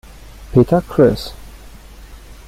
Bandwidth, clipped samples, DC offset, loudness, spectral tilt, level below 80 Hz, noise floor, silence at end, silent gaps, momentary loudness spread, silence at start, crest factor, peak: 16 kHz; under 0.1%; under 0.1%; -15 LUFS; -8 dB/octave; -36 dBFS; -37 dBFS; 0.15 s; none; 12 LU; 0.4 s; 16 dB; -2 dBFS